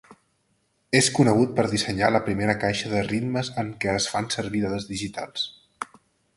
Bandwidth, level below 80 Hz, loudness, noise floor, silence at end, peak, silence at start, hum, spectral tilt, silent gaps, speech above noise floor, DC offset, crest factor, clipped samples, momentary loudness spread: 11.5 kHz; -52 dBFS; -24 LUFS; -69 dBFS; 0.55 s; -4 dBFS; 0.1 s; none; -4.5 dB/octave; none; 46 dB; under 0.1%; 22 dB; under 0.1%; 12 LU